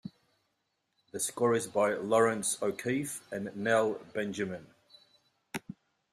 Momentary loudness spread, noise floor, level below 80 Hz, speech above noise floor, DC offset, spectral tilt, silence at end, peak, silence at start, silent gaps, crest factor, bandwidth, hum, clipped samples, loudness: 17 LU; -80 dBFS; -74 dBFS; 49 dB; under 0.1%; -4 dB/octave; 0.4 s; -14 dBFS; 0.05 s; none; 20 dB; 15.5 kHz; none; under 0.1%; -31 LUFS